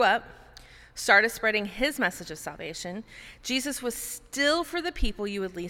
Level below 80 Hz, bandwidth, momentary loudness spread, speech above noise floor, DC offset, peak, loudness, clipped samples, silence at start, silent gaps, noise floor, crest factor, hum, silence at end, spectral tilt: -42 dBFS; 19 kHz; 17 LU; 23 dB; under 0.1%; -6 dBFS; -27 LUFS; under 0.1%; 0 s; none; -51 dBFS; 22 dB; none; 0 s; -2.5 dB/octave